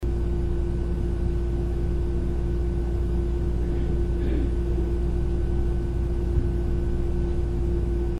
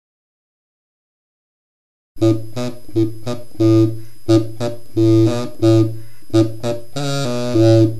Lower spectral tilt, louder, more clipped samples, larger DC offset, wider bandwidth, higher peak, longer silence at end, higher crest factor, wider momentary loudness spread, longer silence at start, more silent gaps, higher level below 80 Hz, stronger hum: first, -9 dB/octave vs -7.5 dB/octave; second, -27 LUFS vs -17 LUFS; neither; second, under 0.1% vs 6%; second, 5.2 kHz vs 12.5 kHz; second, -10 dBFS vs 0 dBFS; about the same, 0 s vs 0 s; about the same, 14 dB vs 16 dB; second, 2 LU vs 13 LU; second, 0 s vs 2.15 s; neither; first, -26 dBFS vs -50 dBFS; neither